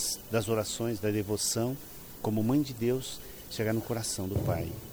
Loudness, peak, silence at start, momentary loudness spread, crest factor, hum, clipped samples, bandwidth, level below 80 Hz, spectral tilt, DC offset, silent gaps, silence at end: -31 LUFS; -16 dBFS; 0 s; 10 LU; 14 dB; none; under 0.1%; over 20 kHz; -52 dBFS; -5 dB/octave; under 0.1%; none; 0 s